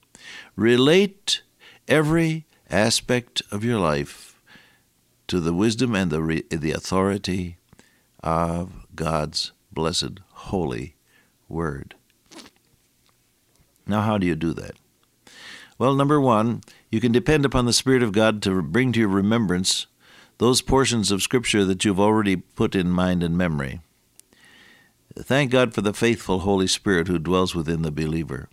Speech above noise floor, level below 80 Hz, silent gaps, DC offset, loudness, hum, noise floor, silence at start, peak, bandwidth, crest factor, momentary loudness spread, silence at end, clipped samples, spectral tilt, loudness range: 42 dB; -44 dBFS; none; under 0.1%; -22 LUFS; none; -64 dBFS; 0.25 s; -4 dBFS; 15.5 kHz; 20 dB; 14 LU; 0.05 s; under 0.1%; -5 dB/octave; 8 LU